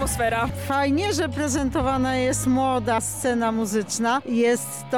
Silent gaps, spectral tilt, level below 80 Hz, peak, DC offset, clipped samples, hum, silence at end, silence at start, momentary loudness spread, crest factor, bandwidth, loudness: none; -4.5 dB/octave; -40 dBFS; -12 dBFS; 0.2%; under 0.1%; none; 0 s; 0 s; 3 LU; 10 dB; 19 kHz; -23 LUFS